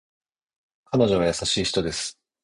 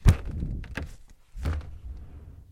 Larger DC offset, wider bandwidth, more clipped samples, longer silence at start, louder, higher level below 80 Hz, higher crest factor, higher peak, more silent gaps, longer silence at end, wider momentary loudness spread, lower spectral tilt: neither; second, 11 kHz vs 16 kHz; neither; first, 0.9 s vs 0 s; first, -23 LUFS vs -33 LUFS; second, -48 dBFS vs -32 dBFS; second, 18 dB vs 26 dB; second, -8 dBFS vs -4 dBFS; neither; first, 0.3 s vs 0.1 s; second, 9 LU vs 18 LU; second, -4 dB/octave vs -6.5 dB/octave